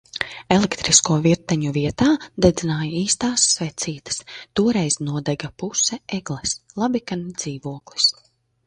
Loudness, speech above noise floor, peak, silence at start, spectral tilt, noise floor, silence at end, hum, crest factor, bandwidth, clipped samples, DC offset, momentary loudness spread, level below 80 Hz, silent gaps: -20 LUFS; 38 dB; 0 dBFS; 0.15 s; -3.5 dB/octave; -59 dBFS; 0.55 s; none; 22 dB; 11 kHz; under 0.1%; under 0.1%; 12 LU; -46 dBFS; none